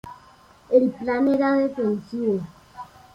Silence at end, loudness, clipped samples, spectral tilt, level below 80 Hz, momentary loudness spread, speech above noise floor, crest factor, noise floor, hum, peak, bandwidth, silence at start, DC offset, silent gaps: 0.3 s; -22 LUFS; under 0.1%; -8 dB/octave; -60 dBFS; 22 LU; 31 dB; 18 dB; -52 dBFS; none; -6 dBFS; 7.4 kHz; 0.05 s; under 0.1%; none